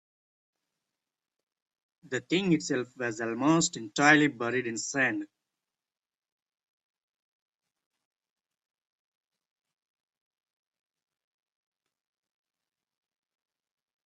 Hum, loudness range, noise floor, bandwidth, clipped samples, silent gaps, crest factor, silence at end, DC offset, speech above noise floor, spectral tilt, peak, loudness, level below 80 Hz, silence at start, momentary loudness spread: none; 9 LU; -90 dBFS; 8.4 kHz; under 0.1%; none; 26 dB; 8.8 s; under 0.1%; 62 dB; -4 dB/octave; -8 dBFS; -27 LUFS; -76 dBFS; 2.1 s; 14 LU